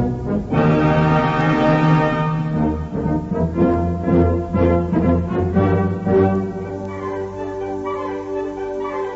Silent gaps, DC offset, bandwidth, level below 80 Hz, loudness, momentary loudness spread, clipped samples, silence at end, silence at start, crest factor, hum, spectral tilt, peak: none; under 0.1%; 7.6 kHz; -34 dBFS; -19 LUFS; 10 LU; under 0.1%; 0 s; 0 s; 14 dB; none; -9 dB/octave; -4 dBFS